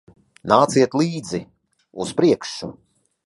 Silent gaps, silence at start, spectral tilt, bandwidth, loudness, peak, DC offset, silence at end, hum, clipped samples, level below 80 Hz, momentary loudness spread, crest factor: none; 0.45 s; -5.5 dB/octave; 11.5 kHz; -20 LUFS; 0 dBFS; under 0.1%; 0.55 s; none; under 0.1%; -58 dBFS; 19 LU; 22 dB